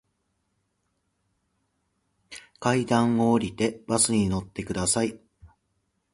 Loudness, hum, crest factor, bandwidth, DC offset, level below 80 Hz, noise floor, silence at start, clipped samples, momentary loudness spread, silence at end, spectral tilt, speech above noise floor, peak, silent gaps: -25 LUFS; none; 20 dB; 11.5 kHz; under 0.1%; -52 dBFS; -75 dBFS; 2.3 s; under 0.1%; 11 LU; 0.65 s; -4.5 dB/octave; 51 dB; -8 dBFS; none